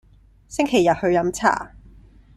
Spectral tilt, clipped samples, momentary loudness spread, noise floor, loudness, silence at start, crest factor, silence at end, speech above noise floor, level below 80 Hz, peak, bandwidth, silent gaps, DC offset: -5 dB/octave; under 0.1%; 12 LU; -48 dBFS; -20 LUFS; 0.5 s; 20 dB; 0.7 s; 28 dB; -48 dBFS; -2 dBFS; 13.5 kHz; none; under 0.1%